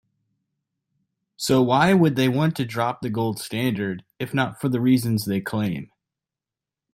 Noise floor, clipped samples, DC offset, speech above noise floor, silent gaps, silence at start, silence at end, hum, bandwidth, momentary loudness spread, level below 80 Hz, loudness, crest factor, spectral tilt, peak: -89 dBFS; under 0.1%; under 0.1%; 67 dB; none; 1.4 s; 1.1 s; none; 16.5 kHz; 11 LU; -60 dBFS; -22 LUFS; 18 dB; -6 dB/octave; -6 dBFS